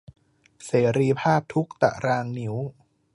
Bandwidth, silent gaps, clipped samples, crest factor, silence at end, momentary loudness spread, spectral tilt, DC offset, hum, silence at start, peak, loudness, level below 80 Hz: 11.5 kHz; none; under 0.1%; 22 dB; 0.45 s; 11 LU; -7 dB/octave; under 0.1%; none; 0.6 s; -4 dBFS; -24 LUFS; -60 dBFS